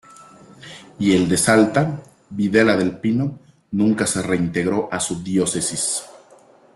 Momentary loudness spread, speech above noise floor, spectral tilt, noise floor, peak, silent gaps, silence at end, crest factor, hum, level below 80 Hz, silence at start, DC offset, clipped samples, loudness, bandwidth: 12 LU; 31 dB; -4.5 dB/octave; -50 dBFS; -2 dBFS; none; 0.6 s; 18 dB; none; -54 dBFS; 0.2 s; under 0.1%; under 0.1%; -19 LUFS; 12.5 kHz